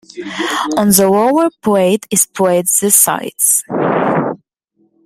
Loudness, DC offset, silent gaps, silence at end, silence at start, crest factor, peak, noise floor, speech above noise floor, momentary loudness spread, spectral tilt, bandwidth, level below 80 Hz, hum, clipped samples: -12 LUFS; under 0.1%; none; 0.7 s; 0.15 s; 14 dB; 0 dBFS; -60 dBFS; 47 dB; 9 LU; -3.5 dB/octave; over 20 kHz; -56 dBFS; none; under 0.1%